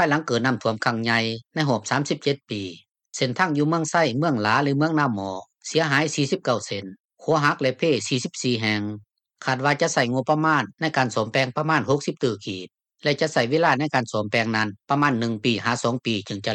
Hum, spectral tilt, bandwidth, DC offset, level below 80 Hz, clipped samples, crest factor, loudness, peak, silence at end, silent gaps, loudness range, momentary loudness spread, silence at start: none; -5 dB/octave; 10.5 kHz; under 0.1%; -68 dBFS; under 0.1%; 18 dB; -23 LUFS; -6 dBFS; 0 s; 7.00-7.04 s; 2 LU; 10 LU; 0 s